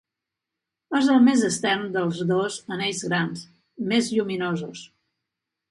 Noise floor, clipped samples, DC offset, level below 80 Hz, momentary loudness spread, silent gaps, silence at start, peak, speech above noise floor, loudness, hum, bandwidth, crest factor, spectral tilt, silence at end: -86 dBFS; under 0.1%; under 0.1%; -68 dBFS; 14 LU; none; 0.9 s; -8 dBFS; 63 dB; -23 LUFS; none; 11.5 kHz; 16 dB; -4.5 dB/octave; 0.85 s